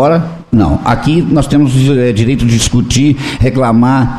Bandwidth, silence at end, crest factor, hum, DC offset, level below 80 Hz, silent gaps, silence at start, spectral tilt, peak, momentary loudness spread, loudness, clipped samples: 13 kHz; 0 s; 8 dB; none; 2%; -26 dBFS; none; 0 s; -6 dB/octave; 0 dBFS; 3 LU; -10 LUFS; under 0.1%